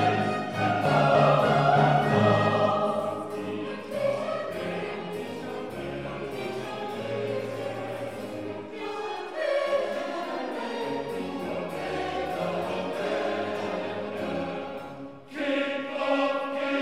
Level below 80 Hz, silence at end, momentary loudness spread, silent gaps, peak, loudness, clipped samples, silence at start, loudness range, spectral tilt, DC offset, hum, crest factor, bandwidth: -62 dBFS; 0 s; 13 LU; none; -8 dBFS; -28 LUFS; under 0.1%; 0 s; 10 LU; -6.5 dB/octave; 0.2%; none; 18 dB; 15 kHz